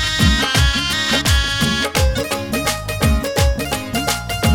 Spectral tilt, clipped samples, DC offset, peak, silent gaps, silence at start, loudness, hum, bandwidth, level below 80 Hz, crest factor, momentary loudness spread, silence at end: -3.5 dB/octave; under 0.1%; under 0.1%; 0 dBFS; none; 0 s; -17 LUFS; none; 19 kHz; -22 dBFS; 16 dB; 6 LU; 0 s